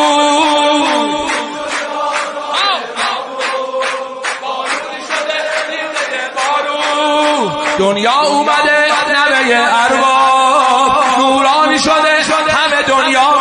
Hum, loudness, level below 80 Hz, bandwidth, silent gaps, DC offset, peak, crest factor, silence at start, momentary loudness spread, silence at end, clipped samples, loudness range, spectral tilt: none; -12 LUFS; -52 dBFS; 10.5 kHz; none; under 0.1%; 0 dBFS; 12 dB; 0 s; 8 LU; 0 s; under 0.1%; 7 LU; -2 dB/octave